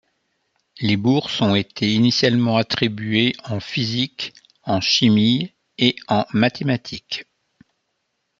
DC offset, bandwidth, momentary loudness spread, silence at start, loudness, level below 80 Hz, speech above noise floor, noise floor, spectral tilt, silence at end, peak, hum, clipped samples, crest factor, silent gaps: under 0.1%; 7.6 kHz; 13 LU; 0.75 s; -19 LUFS; -60 dBFS; 54 dB; -73 dBFS; -5.5 dB/octave; 1.15 s; 0 dBFS; none; under 0.1%; 20 dB; none